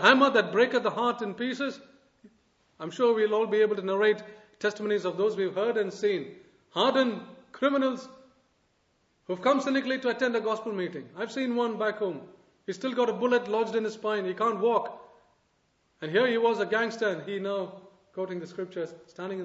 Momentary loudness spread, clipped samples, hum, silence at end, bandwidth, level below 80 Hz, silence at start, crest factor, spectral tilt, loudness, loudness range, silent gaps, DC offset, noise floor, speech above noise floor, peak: 13 LU; under 0.1%; none; 0 s; 8 kHz; -78 dBFS; 0 s; 24 dB; -5 dB/octave; -28 LUFS; 3 LU; none; under 0.1%; -71 dBFS; 44 dB; -4 dBFS